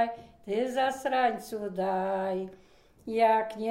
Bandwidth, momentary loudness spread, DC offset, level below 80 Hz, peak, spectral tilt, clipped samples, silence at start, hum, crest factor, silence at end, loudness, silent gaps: 16 kHz; 11 LU; under 0.1%; -66 dBFS; -14 dBFS; -5 dB/octave; under 0.1%; 0 s; none; 16 dB; 0 s; -29 LUFS; none